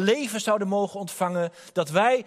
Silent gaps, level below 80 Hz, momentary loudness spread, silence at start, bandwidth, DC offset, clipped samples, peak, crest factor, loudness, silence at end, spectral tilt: none; -74 dBFS; 7 LU; 0 s; 15.5 kHz; under 0.1%; under 0.1%; -6 dBFS; 18 dB; -26 LUFS; 0.05 s; -4.5 dB/octave